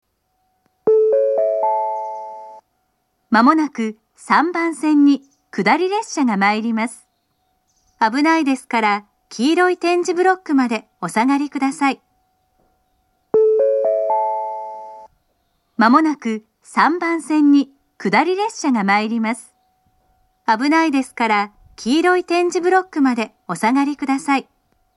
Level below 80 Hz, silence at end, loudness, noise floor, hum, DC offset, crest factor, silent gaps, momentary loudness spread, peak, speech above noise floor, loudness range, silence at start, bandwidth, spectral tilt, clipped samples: -66 dBFS; 0.55 s; -18 LUFS; -68 dBFS; none; under 0.1%; 18 dB; none; 12 LU; 0 dBFS; 51 dB; 3 LU; 0.85 s; 12 kHz; -4.5 dB/octave; under 0.1%